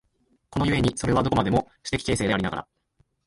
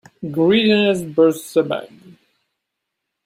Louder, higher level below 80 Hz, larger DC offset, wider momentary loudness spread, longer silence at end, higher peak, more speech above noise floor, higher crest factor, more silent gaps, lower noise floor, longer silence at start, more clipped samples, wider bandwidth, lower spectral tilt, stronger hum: second, -25 LUFS vs -17 LUFS; first, -42 dBFS vs -60 dBFS; neither; second, 8 LU vs 11 LU; second, 0.65 s vs 1.4 s; second, -6 dBFS vs -2 dBFS; second, 44 dB vs 62 dB; about the same, 20 dB vs 16 dB; neither; second, -68 dBFS vs -79 dBFS; first, 0.5 s vs 0.2 s; neither; second, 11.5 kHz vs 16 kHz; about the same, -5.5 dB/octave vs -5.5 dB/octave; neither